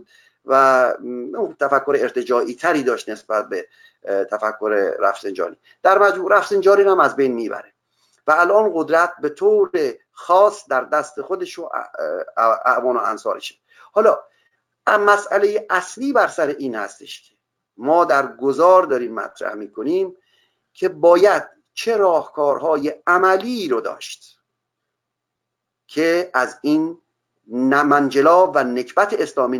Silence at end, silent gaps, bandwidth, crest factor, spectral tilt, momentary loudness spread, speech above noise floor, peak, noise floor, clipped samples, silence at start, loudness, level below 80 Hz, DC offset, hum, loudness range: 0 s; none; 18 kHz; 18 dB; -4.5 dB/octave; 14 LU; 62 dB; 0 dBFS; -80 dBFS; under 0.1%; 0.45 s; -18 LUFS; -72 dBFS; under 0.1%; none; 5 LU